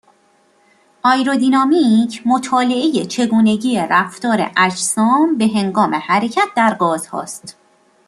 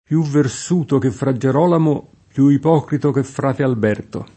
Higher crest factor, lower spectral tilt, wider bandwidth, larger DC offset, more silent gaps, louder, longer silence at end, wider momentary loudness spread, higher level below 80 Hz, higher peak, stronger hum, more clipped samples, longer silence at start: about the same, 14 dB vs 16 dB; second, -4 dB/octave vs -7.5 dB/octave; first, 13 kHz vs 8.8 kHz; neither; neither; about the same, -15 LUFS vs -17 LUFS; first, 0.55 s vs 0.1 s; about the same, 5 LU vs 6 LU; second, -62 dBFS vs -54 dBFS; about the same, -2 dBFS vs 0 dBFS; neither; neither; first, 1.05 s vs 0.1 s